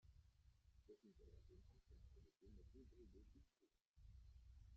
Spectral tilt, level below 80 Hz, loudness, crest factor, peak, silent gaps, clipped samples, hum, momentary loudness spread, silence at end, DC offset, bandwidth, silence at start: -8 dB/octave; -70 dBFS; -69 LUFS; 14 dB; -54 dBFS; 3.87-3.94 s; under 0.1%; none; 2 LU; 0 s; under 0.1%; 6.8 kHz; 0 s